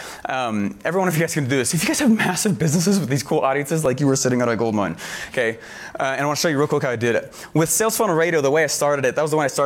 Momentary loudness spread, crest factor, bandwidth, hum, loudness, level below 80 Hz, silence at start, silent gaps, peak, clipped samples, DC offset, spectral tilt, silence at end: 7 LU; 12 dB; 17 kHz; none; -20 LUFS; -56 dBFS; 0 s; none; -8 dBFS; under 0.1%; under 0.1%; -4.5 dB/octave; 0 s